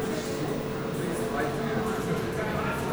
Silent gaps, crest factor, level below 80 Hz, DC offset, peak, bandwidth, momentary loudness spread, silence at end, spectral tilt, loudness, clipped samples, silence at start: none; 12 dB; -48 dBFS; under 0.1%; -16 dBFS; over 20 kHz; 2 LU; 0 s; -5.5 dB/octave; -30 LUFS; under 0.1%; 0 s